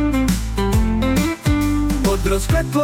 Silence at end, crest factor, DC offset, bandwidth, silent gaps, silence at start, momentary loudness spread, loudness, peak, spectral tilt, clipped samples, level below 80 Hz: 0 s; 10 dB; under 0.1%; 17.5 kHz; none; 0 s; 2 LU; -19 LUFS; -6 dBFS; -6 dB/octave; under 0.1%; -24 dBFS